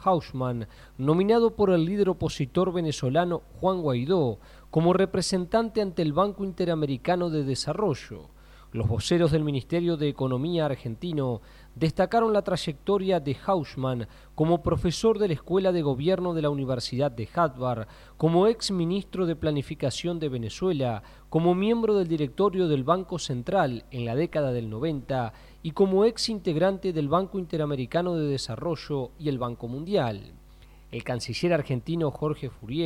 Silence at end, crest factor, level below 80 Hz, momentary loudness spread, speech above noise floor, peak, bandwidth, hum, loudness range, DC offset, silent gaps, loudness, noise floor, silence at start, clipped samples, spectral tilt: 0 s; 18 dB; -50 dBFS; 9 LU; 24 dB; -8 dBFS; 14 kHz; none; 3 LU; under 0.1%; none; -26 LUFS; -50 dBFS; 0 s; under 0.1%; -6.5 dB/octave